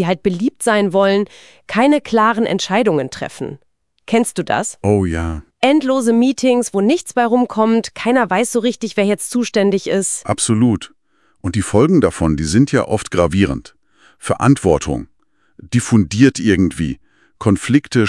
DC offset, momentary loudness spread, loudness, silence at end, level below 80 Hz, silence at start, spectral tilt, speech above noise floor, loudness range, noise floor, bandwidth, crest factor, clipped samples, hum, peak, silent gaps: 0.3%; 10 LU; -16 LUFS; 0 s; -42 dBFS; 0 s; -5.5 dB/octave; 33 dB; 2 LU; -48 dBFS; 12 kHz; 16 dB; under 0.1%; none; 0 dBFS; none